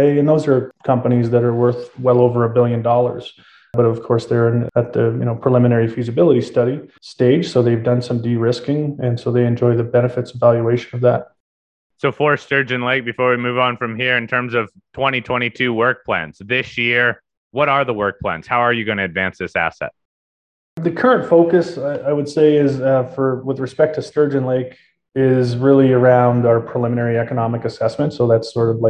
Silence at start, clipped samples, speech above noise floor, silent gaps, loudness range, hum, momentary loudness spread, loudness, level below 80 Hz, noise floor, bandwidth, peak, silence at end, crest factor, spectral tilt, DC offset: 0 s; under 0.1%; over 74 dB; 11.40-11.90 s, 17.37-17.51 s, 20.05-20.77 s; 3 LU; none; 8 LU; -17 LUFS; -52 dBFS; under -90 dBFS; 9 kHz; 0 dBFS; 0 s; 16 dB; -7.5 dB/octave; under 0.1%